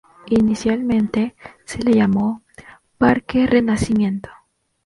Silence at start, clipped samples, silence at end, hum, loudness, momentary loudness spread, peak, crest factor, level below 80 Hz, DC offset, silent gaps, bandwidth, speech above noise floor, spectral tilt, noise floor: 0.25 s; under 0.1%; 0.55 s; none; -18 LUFS; 9 LU; -2 dBFS; 18 dB; -44 dBFS; under 0.1%; none; 11.5 kHz; 28 dB; -6.5 dB/octave; -45 dBFS